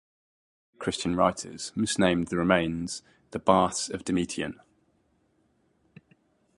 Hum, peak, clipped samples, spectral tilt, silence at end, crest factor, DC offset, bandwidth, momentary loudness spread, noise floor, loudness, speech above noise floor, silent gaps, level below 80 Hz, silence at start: none; -4 dBFS; under 0.1%; -4.5 dB/octave; 2.05 s; 24 dB; under 0.1%; 11.5 kHz; 12 LU; -69 dBFS; -27 LUFS; 42 dB; none; -54 dBFS; 0.8 s